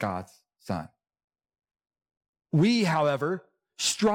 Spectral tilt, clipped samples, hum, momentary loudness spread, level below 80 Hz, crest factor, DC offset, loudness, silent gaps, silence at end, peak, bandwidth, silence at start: -4.5 dB/octave; under 0.1%; none; 13 LU; -68 dBFS; 14 dB; under 0.1%; -27 LUFS; 1.24-1.28 s, 2.28-2.33 s; 0 s; -14 dBFS; 17.5 kHz; 0 s